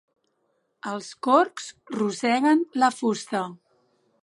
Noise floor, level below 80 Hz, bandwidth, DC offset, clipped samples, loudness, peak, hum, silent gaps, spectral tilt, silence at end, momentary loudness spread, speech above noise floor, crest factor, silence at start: -72 dBFS; -80 dBFS; 11.5 kHz; under 0.1%; under 0.1%; -24 LUFS; -4 dBFS; none; none; -4.5 dB/octave; 0.7 s; 14 LU; 48 dB; 22 dB; 0.85 s